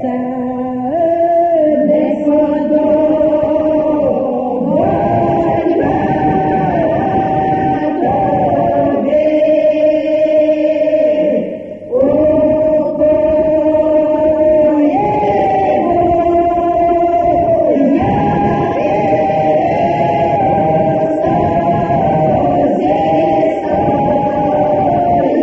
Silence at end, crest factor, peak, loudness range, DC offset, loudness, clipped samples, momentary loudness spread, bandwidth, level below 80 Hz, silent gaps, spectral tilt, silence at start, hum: 0 s; 10 dB; -2 dBFS; 2 LU; 0.1%; -13 LUFS; under 0.1%; 3 LU; 6.4 kHz; -40 dBFS; none; -9.5 dB/octave; 0 s; none